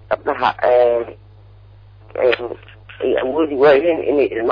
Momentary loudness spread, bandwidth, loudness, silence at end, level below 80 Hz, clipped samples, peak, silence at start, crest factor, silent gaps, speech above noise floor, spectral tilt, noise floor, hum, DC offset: 16 LU; 5.2 kHz; -16 LUFS; 0 s; -50 dBFS; under 0.1%; -4 dBFS; 0.1 s; 14 dB; none; 27 dB; -7.5 dB/octave; -43 dBFS; none; under 0.1%